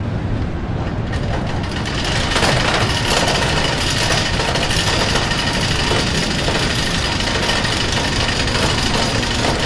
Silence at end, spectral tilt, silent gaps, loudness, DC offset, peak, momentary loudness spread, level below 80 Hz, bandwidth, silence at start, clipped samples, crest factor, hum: 0 s; -3.5 dB/octave; none; -17 LUFS; under 0.1%; -2 dBFS; 7 LU; -26 dBFS; 11 kHz; 0 s; under 0.1%; 16 dB; none